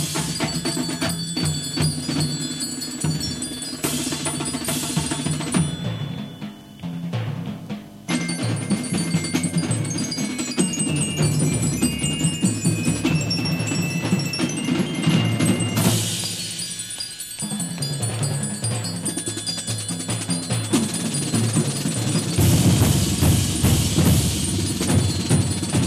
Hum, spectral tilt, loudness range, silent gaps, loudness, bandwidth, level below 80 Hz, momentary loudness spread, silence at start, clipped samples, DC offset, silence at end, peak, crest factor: none; -4.5 dB/octave; 6 LU; none; -22 LUFS; 15 kHz; -40 dBFS; 9 LU; 0 s; under 0.1%; under 0.1%; 0 s; -4 dBFS; 18 dB